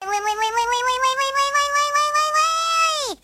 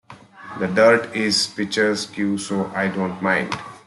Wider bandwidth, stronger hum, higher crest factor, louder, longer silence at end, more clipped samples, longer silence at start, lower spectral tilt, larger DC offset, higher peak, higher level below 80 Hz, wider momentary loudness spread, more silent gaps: first, 16 kHz vs 12 kHz; neither; about the same, 14 dB vs 18 dB; about the same, -19 LUFS vs -20 LUFS; about the same, 0.1 s vs 0.1 s; neither; about the same, 0 s vs 0.1 s; second, 1.5 dB/octave vs -4 dB/octave; neither; second, -6 dBFS vs -2 dBFS; first, -56 dBFS vs -62 dBFS; second, 3 LU vs 9 LU; neither